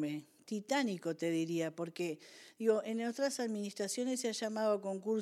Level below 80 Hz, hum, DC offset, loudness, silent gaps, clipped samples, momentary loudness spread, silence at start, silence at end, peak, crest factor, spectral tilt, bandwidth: under -90 dBFS; none; under 0.1%; -37 LUFS; none; under 0.1%; 8 LU; 0 s; 0 s; -18 dBFS; 18 dB; -4.5 dB/octave; 15.5 kHz